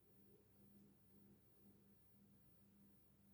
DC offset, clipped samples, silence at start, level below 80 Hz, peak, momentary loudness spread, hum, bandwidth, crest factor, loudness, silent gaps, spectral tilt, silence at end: under 0.1%; under 0.1%; 0 s; -86 dBFS; -58 dBFS; 1 LU; 50 Hz at -80 dBFS; over 20 kHz; 14 dB; -69 LUFS; none; -6.5 dB/octave; 0 s